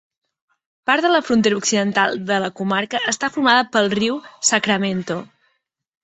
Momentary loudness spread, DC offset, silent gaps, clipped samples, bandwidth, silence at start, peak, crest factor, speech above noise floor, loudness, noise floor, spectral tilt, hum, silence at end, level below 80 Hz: 7 LU; under 0.1%; none; under 0.1%; 8.4 kHz; 0.85 s; -2 dBFS; 18 dB; 53 dB; -18 LUFS; -71 dBFS; -3 dB/octave; none; 0.8 s; -62 dBFS